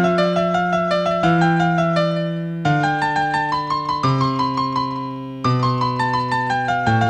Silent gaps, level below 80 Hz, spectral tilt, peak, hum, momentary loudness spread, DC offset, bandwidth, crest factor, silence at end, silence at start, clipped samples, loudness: none; -50 dBFS; -6.5 dB/octave; -4 dBFS; none; 6 LU; under 0.1%; 9.2 kHz; 14 dB; 0 s; 0 s; under 0.1%; -19 LUFS